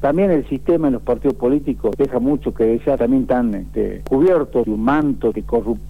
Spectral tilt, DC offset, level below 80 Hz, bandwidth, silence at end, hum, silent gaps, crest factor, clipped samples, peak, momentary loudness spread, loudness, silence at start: -9 dB/octave; 2%; -36 dBFS; 14 kHz; 0 s; none; none; 10 dB; under 0.1%; -6 dBFS; 6 LU; -18 LUFS; 0 s